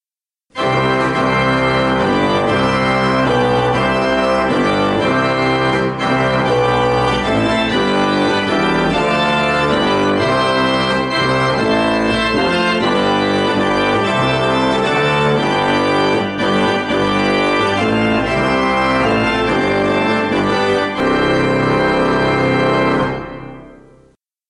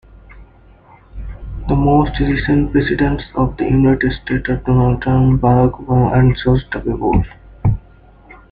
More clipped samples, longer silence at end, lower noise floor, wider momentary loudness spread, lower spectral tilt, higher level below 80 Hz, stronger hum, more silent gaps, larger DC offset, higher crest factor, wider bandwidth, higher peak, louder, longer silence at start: neither; first, 0.75 s vs 0.15 s; first, under -90 dBFS vs -45 dBFS; second, 2 LU vs 10 LU; second, -5.5 dB/octave vs -11 dB/octave; second, -38 dBFS vs -28 dBFS; neither; neither; neither; about the same, 12 dB vs 14 dB; first, 11.5 kHz vs 4.9 kHz; about the same, -4 dBFS vs -2 dBFS; about the same, -15 LUFS vs -15 LUFS; first, 0.55 s vs 0.3 s